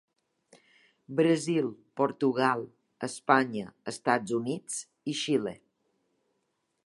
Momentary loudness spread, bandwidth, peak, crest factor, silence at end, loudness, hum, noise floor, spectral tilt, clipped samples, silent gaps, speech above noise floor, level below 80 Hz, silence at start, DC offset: 12 LU; 11.5 kHz; -6 dBFS; 24 dB; 1.3 s; -29 LUFS; none; -78 dBFS; -4.5 dB/octave; under 0.1%; none; 50 dB; -78 dBFS; 1.1 s; under 0.1%